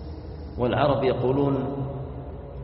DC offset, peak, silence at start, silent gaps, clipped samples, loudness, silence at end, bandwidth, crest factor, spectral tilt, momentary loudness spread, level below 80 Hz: under 0.1%; -8 dBFS; 0 s; none; under 0.1%; -25 LUFS; 0 s; 5.8 kHz; 18 dB; -6.5 dB/octave; 16 LU; -42 dBFS